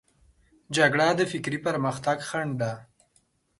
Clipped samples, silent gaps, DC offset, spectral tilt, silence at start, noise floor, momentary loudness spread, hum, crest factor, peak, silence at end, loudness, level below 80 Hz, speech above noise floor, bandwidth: under 0.1%; none; under 0.1%; -5 dB/octave; 0.7 s; -68 dBFS; 10 LU; none; 22 dB; -6 dBFS; 0.75 s; -26 LUFS; -64 dBFS; 42 dB; 11.5 kHz